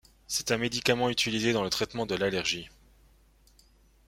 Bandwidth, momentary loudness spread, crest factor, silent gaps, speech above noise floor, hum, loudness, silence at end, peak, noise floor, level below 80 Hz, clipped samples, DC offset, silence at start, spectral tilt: 16.5 kHz; 6 LU; 24 dB; none; 32 dB; none; -28 LUFS; 1.4 s; -6 dBFS; -61 dBFS; -58 dBFS; under 0.1%; under 0.1%; 0.3 s; -3 dB/octave